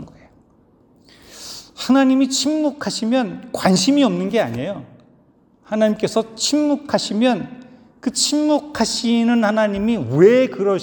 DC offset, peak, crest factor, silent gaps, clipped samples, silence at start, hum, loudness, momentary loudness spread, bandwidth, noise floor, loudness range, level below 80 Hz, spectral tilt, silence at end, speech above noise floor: under 0.1%; 0 dBFS; 18 dB; none; under 0.1%; 0 s; none; -18 LUFS; 13 LU; 19 kHz; -55 dBFS; 3 LU; -54 dBFS; -4.5 dB/octave; 0 s; 37 dB